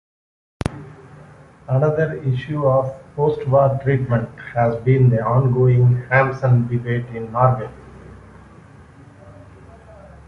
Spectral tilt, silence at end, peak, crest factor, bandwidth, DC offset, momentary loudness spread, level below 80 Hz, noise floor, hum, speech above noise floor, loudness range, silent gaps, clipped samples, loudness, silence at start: -9.5 dB/octave; 0.1 s; -2 dBFS; 16 dB; 5.4 kHz; under 0.1%; 11 LU; -46 dBFS; -44 dBFS; none; 27 dB; 6 LU; none; under 0.1%; -18 LUFS; 0.65 s